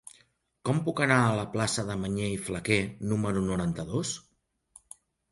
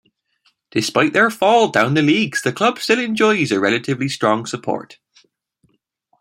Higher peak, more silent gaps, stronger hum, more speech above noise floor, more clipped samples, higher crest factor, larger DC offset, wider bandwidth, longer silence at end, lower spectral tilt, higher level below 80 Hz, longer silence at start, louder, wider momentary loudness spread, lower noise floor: second, -8 dBFS vs 0 dBFS; neither; neither; second, 39 dB vs 47 dB; neither; about the same, 22 dB vs 18 dB; neither; second, 11.5 kHz vs 16.5 kHz; second, 1.1 s vs 1.3 s; about the same, -5 dB/octave vs -4.5 dB/octave; first, -54 dBFS vs -62 dBFS; about the same, 0.65 s vs 0.75 s; second, -29 LUFS vs -17 LUFS; about the same, 11 LU vs 9 LU; about the same, -67 dBFS vs -64 dBFS